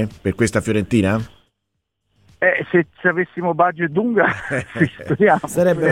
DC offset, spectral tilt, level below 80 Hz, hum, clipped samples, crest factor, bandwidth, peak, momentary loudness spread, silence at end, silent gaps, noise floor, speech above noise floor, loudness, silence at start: under 0.1%; -6.5 dB/octave; -48 dBFS; none; under 0.1%; 18 dB; 16.5 kHz; -2 dBFS; 6 LU; 0 s; none; -75 dBFS; 58 dB; -18 LUFS; 0 s